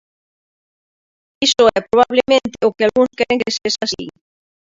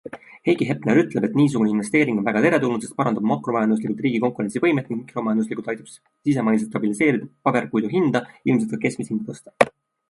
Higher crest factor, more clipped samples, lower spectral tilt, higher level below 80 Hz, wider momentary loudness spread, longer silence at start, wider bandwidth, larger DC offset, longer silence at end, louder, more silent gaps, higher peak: about the same, 18 dB vs 20 dB; neither; second, -3 dB/octave vs -6.5 dB/octave; first, -54 dBFS vs -64 dBFS; about the same, 7 LU vs 9 LU; first, 1.4 s vs 0.05 s; second, 7.8 kHz vs 11.5 kHz; neither; first, 0.65 s vs 0.4 s; first, -15 LUFS vs -22 LUFS; neither; about the same, 0 dBFS vs 0 dBFS